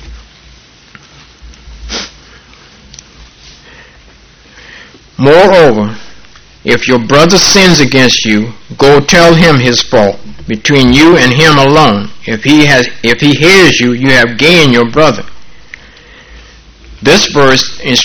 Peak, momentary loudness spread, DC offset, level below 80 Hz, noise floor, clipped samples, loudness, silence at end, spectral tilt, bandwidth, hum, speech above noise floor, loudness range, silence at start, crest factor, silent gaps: 0 dBFS; 14 LU; under 0.1%; -32 dBFS; -39 dBFS; 3%; -6 LUFS; 0 s; -4 dB/octave; over 20 kHz; none; 33 dB; 22 LU; 0 s; 8 dB; none